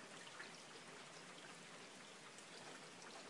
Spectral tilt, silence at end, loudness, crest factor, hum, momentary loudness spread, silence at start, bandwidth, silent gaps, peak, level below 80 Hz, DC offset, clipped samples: -2 dB/octave; 0 s; -56 LUFS; 16 dB; none; 2 LU; 0 s; 12 kHz; none; -40 dBFS; under -90 dBFS; under 0.1%; under 0.1%